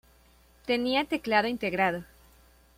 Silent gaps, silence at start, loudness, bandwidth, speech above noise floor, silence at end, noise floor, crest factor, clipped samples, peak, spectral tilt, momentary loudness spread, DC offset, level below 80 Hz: none; 0.65 s; -28 LUFS; 16.5 kHz; 32 dB; 0.75 s; -60 dBFS; 20 dB; under 0.1%; -10 dBFS; -5 dB/octave; 8 LU; under 0.1%; -60 dBFS